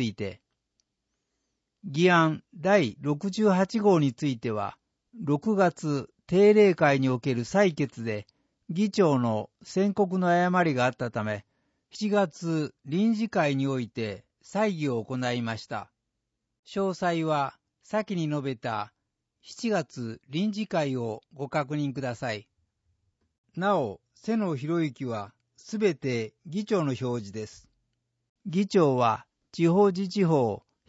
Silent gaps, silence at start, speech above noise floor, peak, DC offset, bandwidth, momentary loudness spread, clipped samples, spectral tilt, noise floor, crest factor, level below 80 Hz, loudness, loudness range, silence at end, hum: 16.59-16.63 s, 23.38-23.44 s, 28.29-28.35 s; 0 s; 56 dB; -8 dBFS; under 0.1%; 8 kHz; 14 LU; under 0.1%; -6.5 dB/octave; -82 dBFS; 20 dB; -68 dBFS; -27 LUFS; 7 LU; 0.3 s; none